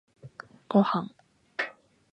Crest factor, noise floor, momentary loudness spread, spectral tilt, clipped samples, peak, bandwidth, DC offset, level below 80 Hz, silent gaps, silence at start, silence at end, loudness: 22 dB; -48 dBFS; 24 LU; -8 dB/octave; under 0.1%; -8 dBFS; 6 kHz; under 0.1%; -74 dBFS; none; 0.25 s; 0.4 s; -28 LUFS